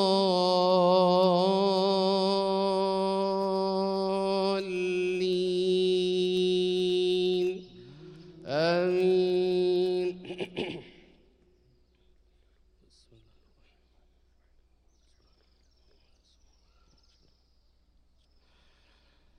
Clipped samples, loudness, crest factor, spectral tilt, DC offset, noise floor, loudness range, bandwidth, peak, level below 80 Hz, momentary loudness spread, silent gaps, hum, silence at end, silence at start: under 0.1%; -27 LUFS; 18 dB; -6 dB/octave; under 0.1%; -65 dBFS; 9 LU; 10.5 kHz; -12 dBFS; -66 dBFS; 13 LU; none; none; 8.5 s; 0 s